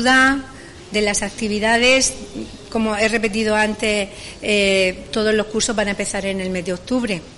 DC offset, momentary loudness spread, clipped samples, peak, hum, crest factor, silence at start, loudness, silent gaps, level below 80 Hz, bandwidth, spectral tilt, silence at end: under 0.1%; 13 LU; under 0.1%; -4 dBFS; none; 14 dB; 0 s; -18 LUFS; none; -42 dBFS; 11.5 kHz; -3 dB/octave; 0 s